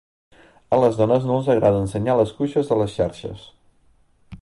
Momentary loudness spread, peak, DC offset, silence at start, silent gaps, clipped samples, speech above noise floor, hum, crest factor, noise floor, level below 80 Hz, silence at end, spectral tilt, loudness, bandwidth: 9 LU; -4 dBFS; under 0.1%; 0.7 s; none; under 0.1%; 38 dB; none; 16 dB; -58 dBFS; -48 dBFS; 0.05 s; -8 dB/octave; -20 LUFS; 11.5 kHz